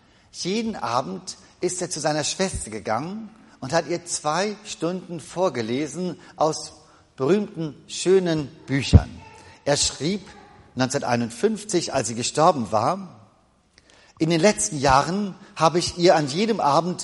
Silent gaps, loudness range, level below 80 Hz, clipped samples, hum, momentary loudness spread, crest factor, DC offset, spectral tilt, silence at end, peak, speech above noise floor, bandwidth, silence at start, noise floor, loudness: none; 5 LU; -38 dBFS; under 0.1%; none; 14 LU; 22 dB; under 0.1%; -4.5 dB/octave; 0 s; -2 dBFS; 37 dB; 11.5 kHz; 0.35 s; -60 dBFS; -23 LUFS